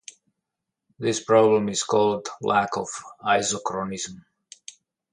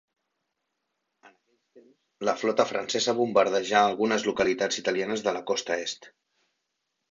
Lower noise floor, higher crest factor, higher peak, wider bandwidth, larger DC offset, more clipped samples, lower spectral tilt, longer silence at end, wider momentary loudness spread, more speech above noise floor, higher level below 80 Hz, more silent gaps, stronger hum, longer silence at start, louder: about the same, -84 dBFS vs -81 dBFS; about the same, 20 dB vs 22 dB; first, -4 dBFS vs -8 dBFS; first, 11 kHz vs 7.8 kHz; neither; neither; about the same, -3.5 dB/octave vs -3 dB/octave; second, 0.9 s vs 1.05 s; first, 18 LU vs 7 LU; first, 61 dB vs 54 dB; about the same, -64 dBFS vs -68 dBFS; neither; neither; second, 1 s vs 1.25 s; first, -23 LUFS vs -26 LUFS